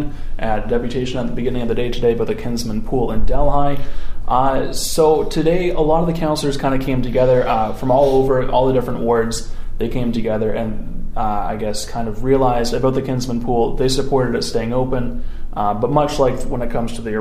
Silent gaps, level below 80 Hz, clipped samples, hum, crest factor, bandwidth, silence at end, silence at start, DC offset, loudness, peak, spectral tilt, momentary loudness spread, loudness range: none; -24 dBFS; under 0.1%; none; 14 dB; 15 kHz; 0 s; 0 s; under 0.1%; -19 LUFS; -2 dBFS; -6 dB/octave; 9 LU; 4 LU